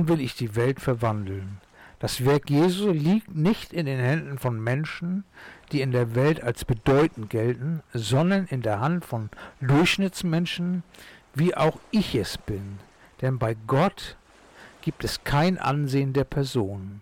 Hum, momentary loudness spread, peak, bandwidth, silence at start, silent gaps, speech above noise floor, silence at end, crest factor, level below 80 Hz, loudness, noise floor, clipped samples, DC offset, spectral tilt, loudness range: none; 12 LU; -16 dBFS; 17 kHz; 0 s; none; 26 dB; 0 s; 10 dB; -48 dBFS; -25 LUFS; -50 dBFS; under 0.1%; under 0.1%; -6.5 dB/octave; 3 LU